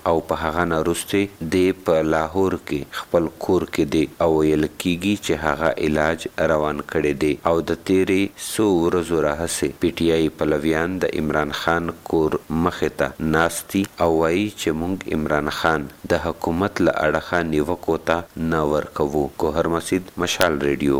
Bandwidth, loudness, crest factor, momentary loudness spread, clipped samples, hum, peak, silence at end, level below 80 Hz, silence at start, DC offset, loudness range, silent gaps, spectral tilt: 17 kHz; -21 LUFS; 20 dB; 4 LU; under 0.1%; none; 0 dBFS; 0 s; -42 dBFS; 0 s; 0.2%; 1 LU; none; -5 dB/octave